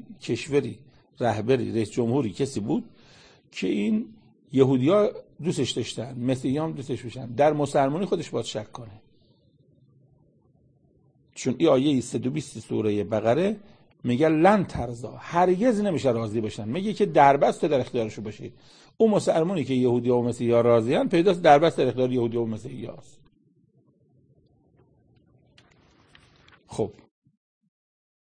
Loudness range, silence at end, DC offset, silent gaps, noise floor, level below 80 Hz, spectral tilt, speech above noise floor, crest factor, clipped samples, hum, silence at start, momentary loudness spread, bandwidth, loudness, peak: 14 LU; 1.45 s; under 0.1%; none; -63 dBFS; -58 dBFS; -6.5 dB/octave; 40 dB; 22 dB; under 0.1%; none; 0.1 s; 14 LU; 9.8 kHz; -24 LUFS; -4 dBFS